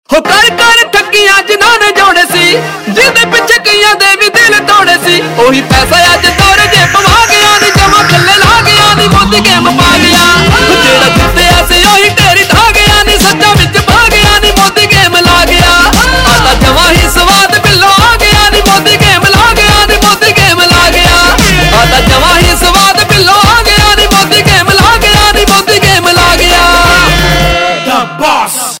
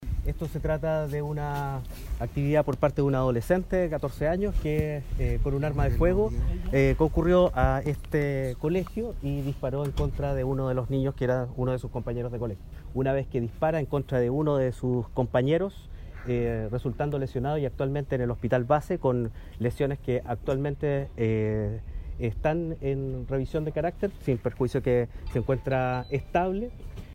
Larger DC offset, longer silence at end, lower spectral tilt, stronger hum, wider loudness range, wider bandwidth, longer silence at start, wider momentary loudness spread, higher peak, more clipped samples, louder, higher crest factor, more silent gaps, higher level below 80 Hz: neither; about the same, 0 s vs 0 s; second, -3 dB/octave vs -8.5 dB/octave; neither; second, 1 LU vs 4 LU; first, over 20 kHz vs 16 kHz; about the same, 0.1 s vs 0 s; second, 2 LU vs 8 LU; first, 0 dBFS vs -10 dBFS; first, 6% vs under 0.1%; first, -4 LUFS vs -28 LUFS; second, 4 dB vs 18 dB; neither; first, -18 dBFS vs -36 dBFS